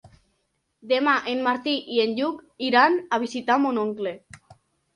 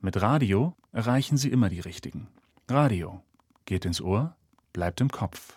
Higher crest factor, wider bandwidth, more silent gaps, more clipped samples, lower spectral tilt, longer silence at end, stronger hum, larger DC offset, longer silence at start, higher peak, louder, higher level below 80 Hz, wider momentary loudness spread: about the same, 20 dB vs 20 dB; second, 11 kHz vs 15.5 kHz; neither; neither; second, -4 dB/octave vs -6.5 dB/octave; first, 0.4 s vs 0.1 s; neither; neither; about the same, 0.05 s vs 0 s; first, -4 dBFS vs -8 dBFS; first, -23 LUFS vs -27 LUFS; second, -68 dBFS vs -52 dBFS; second, 11 LU vs 14 LU